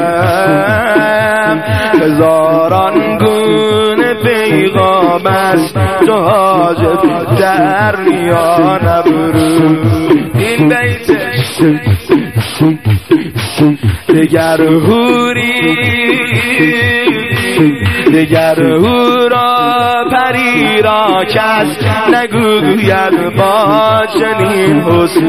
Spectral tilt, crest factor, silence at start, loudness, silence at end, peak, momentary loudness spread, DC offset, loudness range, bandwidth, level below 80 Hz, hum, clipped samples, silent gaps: -6 dB/octave; 10 dB; 0 s; -9 LUFS; 0 s; 0 dBFS; 3 LU; 0.8%; 1 LU; 15.5 kHz; -38 dBFS; none; 0.1%; none